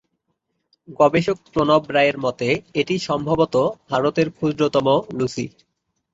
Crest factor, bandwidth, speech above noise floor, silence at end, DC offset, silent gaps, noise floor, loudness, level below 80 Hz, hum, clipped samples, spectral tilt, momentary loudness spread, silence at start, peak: 18 dB; 8 kHz; 54 dB; 0.65 s; under 0.1%; none; -74 dBFS; -20 LUFS; -54 dBFS; none; under 0.1%; -6 dB/octave; 6 LU; 0.9 s; -2 dBFS